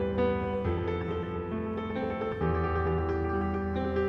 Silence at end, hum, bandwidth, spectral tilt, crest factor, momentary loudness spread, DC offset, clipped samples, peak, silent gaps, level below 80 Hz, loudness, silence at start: 0 s; none; 5.8 kHz; -9.5 dB/octave; 14 dB; 5 LU; under 0.1%; under 0.1%; -16 dBFS; none; -42 dBFS; -31 LUFS; 0 s